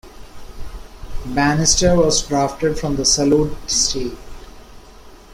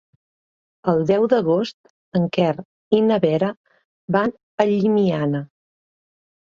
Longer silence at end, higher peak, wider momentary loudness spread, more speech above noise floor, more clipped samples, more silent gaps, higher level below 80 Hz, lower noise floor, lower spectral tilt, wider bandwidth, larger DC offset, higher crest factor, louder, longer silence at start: second, 0 s vs 1.1 s; about the same, 0 dBFS vs -2 dBFS; first, 24 LU vs 9 LU; second, 24 dB vs over 71 dB; neither; second, none vs 1.74-1.84 s, 1.90-2.12 s, 2.65-2.91 s, 3.57-3.64 s, 3.85-4.08 s, 4.43-4.58 s; first, -32 dBFS vs -62 dBFS; second, -41 dBFS vs under -90 dBFS; second, -3.5 dB/octave vs -8 dB/octave; first, 16 kHz vs 7.2 kHz; neither; about the same, 18 dB vs 18 dB; first, -16 LUFS vs -20 LUFS; second, 0.05 s vs 0.85 s